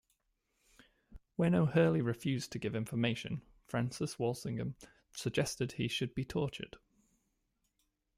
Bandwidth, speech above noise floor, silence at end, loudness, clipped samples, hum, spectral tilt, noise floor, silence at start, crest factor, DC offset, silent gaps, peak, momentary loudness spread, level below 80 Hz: 15.5 kHz; 47 dB; 1.4 s; -36 LUFS; under 0.1%; none; -6 dB/octave; -81 dBFS; 1.1 s; 22 dB; under 0.1%; none; -16 dBFS; 15 LU; -64 dBFS